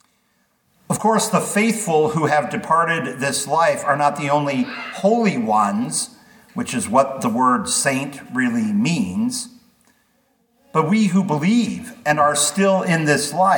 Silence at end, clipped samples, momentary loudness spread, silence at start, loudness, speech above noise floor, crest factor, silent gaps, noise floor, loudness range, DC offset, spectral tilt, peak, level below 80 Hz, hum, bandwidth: 0 s; under 0.1%; 8 LU; 0.9 s; -19 LUFS; 46 dB; 18 dB; none; -64 dBFS; 3 LU; under 0.1%; -4.5 dB/octave; -2 dBFS; -64 dBFS; none; 19 kHz